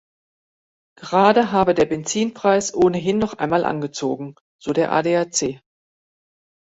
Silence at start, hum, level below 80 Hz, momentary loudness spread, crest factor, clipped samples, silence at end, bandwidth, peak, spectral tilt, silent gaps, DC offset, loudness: 1 s; none; -54 dBFS; 12 LU; 20 dB; under 0.1%; 1.2 s; 8.2 kHz; -2 dBFS; -4.5 dB/octave; 4.41-4.59 s; under 0.1%; -19 LUFS